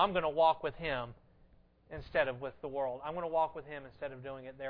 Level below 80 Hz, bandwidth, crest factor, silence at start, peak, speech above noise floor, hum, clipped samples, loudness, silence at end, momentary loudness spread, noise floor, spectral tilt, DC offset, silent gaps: -60 dBFS; 5.2 kHz; 20 dB; 0 s; -16 dBFS; 29 dB; none; under 0.1%; -35 LUFS; 0 s; 17 LU; -64 dBFS; -8 dB/octave; under 0.1%; none